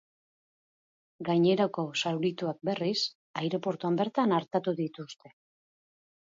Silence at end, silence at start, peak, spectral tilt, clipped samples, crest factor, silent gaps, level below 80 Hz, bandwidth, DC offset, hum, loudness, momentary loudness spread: 1.05 s; 1.2 s; -14 dBFS; -6 dB/octave; under 0.1%; 18 dB; 3.15-3.34 s; -80 dBFS; 7.8 kHz; under 0.1%; none; -30 LUFS; 10 LU